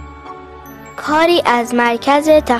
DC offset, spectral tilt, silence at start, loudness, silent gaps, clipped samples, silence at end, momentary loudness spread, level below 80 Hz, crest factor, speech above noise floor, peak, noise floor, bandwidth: under 0.1%; -4 dB/octave; 0 s; -13 LUFS; none; under 0.1%; 0 s; 22 LU; -42 dBFS; 14 dB; 22 dB; 0 dBFS; -34 dBFS; 13.5 kHz